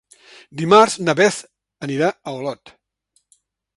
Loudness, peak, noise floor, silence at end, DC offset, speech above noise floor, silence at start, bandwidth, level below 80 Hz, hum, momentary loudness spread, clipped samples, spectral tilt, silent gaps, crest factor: -17 LUFS; 0 dBFS; -66 dBFS; 1.25 s; under 0.1%; 49 dB; 0.55 s; 11.5 kHz; -64 dBFS; none; 19 LU; under 0.1%; -4.5 dB/octave; none; 20 dB